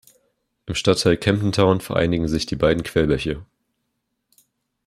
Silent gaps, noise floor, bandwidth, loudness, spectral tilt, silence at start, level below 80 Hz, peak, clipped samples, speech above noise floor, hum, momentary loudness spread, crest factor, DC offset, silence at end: none; -75 dBFS; 15 kHz; -20 LUFS; -5.5 dB/octave; 0.65 s; -42 dBFS; -2 dBFS; under 0.1%; 56 dB; none; 10 LU; 20 dB; under 0.1%; 1.45 s